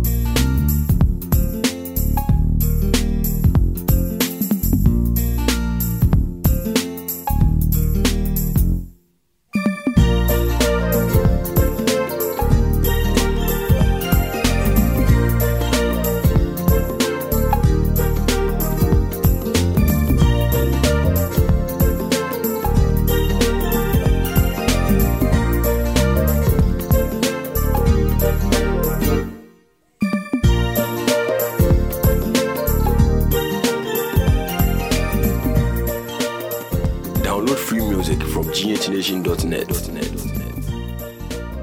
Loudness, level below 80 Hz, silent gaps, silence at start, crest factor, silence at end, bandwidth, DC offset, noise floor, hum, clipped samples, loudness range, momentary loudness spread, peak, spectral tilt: -19 LUFS; -22 dBFS; none; 0 s; 16 dB; 0 s; 16.5 kHz; under 0.1%; -63 dBFS; none; under 0.1%; 3 LU; 5 LU; -2 dBFS; -6 dB/octave